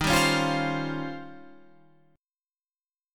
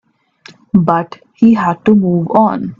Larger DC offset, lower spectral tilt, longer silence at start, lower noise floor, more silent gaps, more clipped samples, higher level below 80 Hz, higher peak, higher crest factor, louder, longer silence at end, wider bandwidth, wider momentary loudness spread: neither; second, -4 dB/octave vs -9.5 dB/octave; second, 0 s vs 0.75 s; first, under -90 dBFS vs -43 dBFS; first, 2.19-2.24 s vs none; neither; about the same, -50 dBFS vs -52 dBFS; second, -8 dBFS vs 0 dBFS; first, 22 dB vs 12 dB; second, -26 LUFS vs -12 LUFS; about the same, 0 s vs 0.05 s; first, 17.5 kHz vs 7 kHz; first, 19 LU vs 5 LU